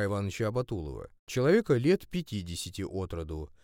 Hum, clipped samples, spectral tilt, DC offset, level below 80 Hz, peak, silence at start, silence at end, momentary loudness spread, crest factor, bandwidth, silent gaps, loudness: none; under 0.1%; -6 dB/octave; under 0.1%; -50 dBFS; -12 dBFS; 0 s; 0.15 s; 13 LU; 18 dB; 17 kHz; 1.19-1.27 s; -31 LUFS